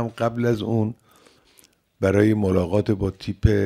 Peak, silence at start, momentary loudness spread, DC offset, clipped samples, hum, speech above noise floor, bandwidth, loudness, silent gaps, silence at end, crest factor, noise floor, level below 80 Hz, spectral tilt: -4 dBFS; 0 s; 7 LU; under 0.1%; under 0.1%; none; 37 dB; 14 kHz; -22 LUFS; none; 0 s; 18 dB; -58 dBFS; -38 dBFS; -8 dB/octave